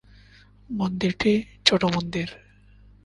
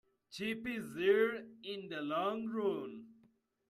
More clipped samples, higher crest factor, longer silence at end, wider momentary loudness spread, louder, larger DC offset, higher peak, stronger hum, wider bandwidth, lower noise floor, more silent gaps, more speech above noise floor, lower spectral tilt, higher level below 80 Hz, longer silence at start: neither; about the same, 24 dB vs 20 dB; about the same, 0.65 s vs 0.55 s; second, 12 LU vs 15 LU; first, -24 LUFS vs -37 LUFS; neither; first, -2 dBFS vs -18 dBFS; first, 50 Hz at -45 dBFS vs none; second, 11 kHz vs 13 kHz; second, -52 dBFS vs -72 dBFS; neither; second, 28 dB vs 35 dB; about the same, -5 dB/octave vs -5.5 dB/octave; first, -50 dBFS vs -78 dBFS; first, 0.7 s vs 0.3 s